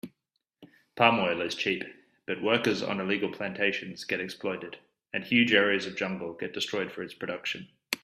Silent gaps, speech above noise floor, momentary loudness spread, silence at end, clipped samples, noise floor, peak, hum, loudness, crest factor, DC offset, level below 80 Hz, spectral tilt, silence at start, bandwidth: none; 52 dB; 14 LU; 0.05 s; under 0.1%; -82 dBFS; -6 dBFS; none; -29 LUFS; 24 dB; under 0.1%; -72 dBFS; -4.5 dB/octave; 0.05 s; 15 kHz